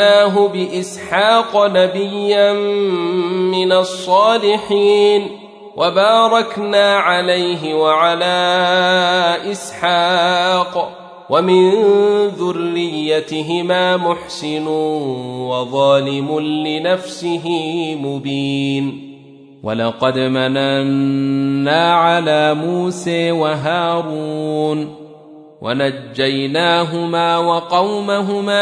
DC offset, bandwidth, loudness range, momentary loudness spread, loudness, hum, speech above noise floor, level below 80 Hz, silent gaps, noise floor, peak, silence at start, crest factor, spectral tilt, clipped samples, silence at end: under 0.1%; 11 kHz; 5 LU; 9 LU; -15 LUFS; none; 26 dB; -64 dBFS; none; -40 dBFS; 0 dBFS; 0 s; 14 dB; -5 dB/octave; under 0.1%; 0 s